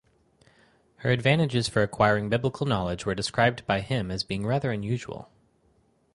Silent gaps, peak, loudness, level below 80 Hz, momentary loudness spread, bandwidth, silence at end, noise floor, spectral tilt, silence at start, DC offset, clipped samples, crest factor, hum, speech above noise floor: none; -6 dBFS; -26 LUFS; -52 dBFS; 8 LU; 11.5 kHz; 0.9 s; -65 dBFS; -5.5 dB/octave; 1 s; under 0.1%; under 0.1%; 20 dB; none; 40 dB